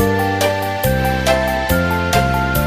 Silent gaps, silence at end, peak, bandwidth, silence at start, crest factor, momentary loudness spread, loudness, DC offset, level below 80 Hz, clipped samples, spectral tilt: none; 0 s; -2 dBFS; 16 kHz; 0 s; 14 dB; 2 LU; -16 LUFS; under 0.1%; -28 dBFS; under 0.1%; -5 dB/octave